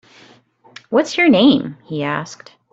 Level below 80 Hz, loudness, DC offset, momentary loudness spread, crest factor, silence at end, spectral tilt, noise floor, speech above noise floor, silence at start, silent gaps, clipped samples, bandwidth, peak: -58 dBFS; -16 LUFS; under 0.1%; 14 LU; 16 dB; 0.4 s; -5.5 dB/octave; -50 dBFS; 34 dB; 0.9 s; none; under 0.1%; 8 kHz; -2 dBFS